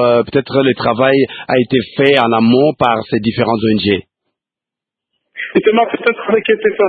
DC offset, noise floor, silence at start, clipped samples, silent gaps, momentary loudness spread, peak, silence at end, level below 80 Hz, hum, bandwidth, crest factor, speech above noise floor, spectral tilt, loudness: under 0.1%; -86 dBFS; 0 s; under 0.1%; none; 5 LU; 0 dBFS; 0 s; -50 dBFS; none; 4.8 kHz; 14 dB; 73 dB; -8.5 dB/octave; -13 LUFS